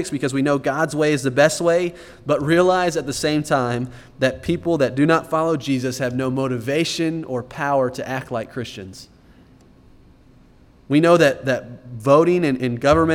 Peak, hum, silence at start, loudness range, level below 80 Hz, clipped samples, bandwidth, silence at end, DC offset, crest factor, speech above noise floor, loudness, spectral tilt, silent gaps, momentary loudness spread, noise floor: -2 dBFS; none; 0 s; 7 LU; -48 dBFS; under 0.1%; 16.5 kHz; 0 s; under 0.1%; 18 dB; 31 dB; -20 LUFS; -5.5 dB/octave; none; 12 LU; -50 dBFS